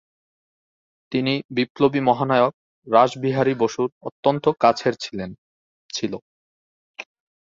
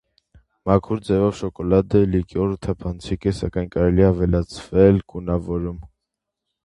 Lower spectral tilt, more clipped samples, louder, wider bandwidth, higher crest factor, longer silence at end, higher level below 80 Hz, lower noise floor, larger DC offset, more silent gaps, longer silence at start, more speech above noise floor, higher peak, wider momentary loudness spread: second, -6 dB/octave vs -8.5 dB/octave; neither; about the same, -21 LUFS vs -21 LUFS; second, 7.8 kHz vs 11 kHz; about the same, 20 dB vs 20 dB; second, 0.45 s vs 0.8 s; second, -62 dBFS vs -34 dBFS; first, under -90 dBFS vs -82 dBFS; neither; first, 1.45-1.49 s, 1.70-1.75 s, 2.54-2.82 s, 3.92-4.01 s, 4.12-4.23 s, 5.38-5.89 s, 6.22-6.94 s vs none; first, 1.1 s vs 0.65 s; first, over 70 dB vs 62 dB; about the same, -2 dBFS vs 0 dBFS; first, 16 LU vs 11 LU